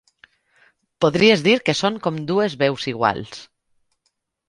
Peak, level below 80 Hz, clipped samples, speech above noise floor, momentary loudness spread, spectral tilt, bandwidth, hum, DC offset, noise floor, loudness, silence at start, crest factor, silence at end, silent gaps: -2 dBFS; -58 dBFS; under 0.1%; 53 dB; 13 LU; -5 dB/octave; 11.5 kHz; none; under 0.1%; -72 dBFS; -19 LUFS; 1 s; 20 dB; 1.05 s; none